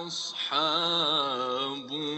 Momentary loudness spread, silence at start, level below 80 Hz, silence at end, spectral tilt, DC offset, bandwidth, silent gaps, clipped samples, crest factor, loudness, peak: 8 LU; 0 s; -76 dBFS; 0 s; -3 dB/octave; under 0.1%; 8.4 kHz; none; under 0.1%; 16 dB; -27 LUFS; -12 dBFS